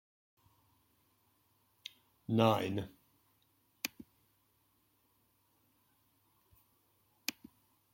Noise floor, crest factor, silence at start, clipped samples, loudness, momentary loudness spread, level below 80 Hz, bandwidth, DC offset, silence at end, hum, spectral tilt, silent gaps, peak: -75 dBFS; 30 dB; 2.3 s; under 0.1%; -36 LUFS; 22 LU; -78 dBFS; 16.5 kHz; under 0.1%; 0.65 s; none; -5.5 dB/octave; none; -12 dBFS